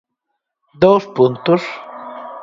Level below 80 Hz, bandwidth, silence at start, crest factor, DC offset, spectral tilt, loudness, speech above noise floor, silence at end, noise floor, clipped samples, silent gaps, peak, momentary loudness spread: -54 dBFS; 7.6 kHz; 0.8 s; 18 dB; under 0.1%; -7.5 dB/octave; -15 LUFS; 61 dB; 0 s; -76 dBFS; under 0.1%; none; 0 dBFS; 18 LU